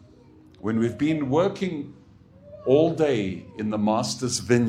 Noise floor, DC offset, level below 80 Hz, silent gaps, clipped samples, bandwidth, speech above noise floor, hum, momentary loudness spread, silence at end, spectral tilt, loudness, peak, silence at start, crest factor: -51 dBFS; under 0.1%; -58 dBFS; none; under 0.1%; 15 kHz; 28 dB; none; 11 LU; 0 s; -5.5 dB/octave; -24 LUFS; -6 dBFS; 0.65 s; 18 dB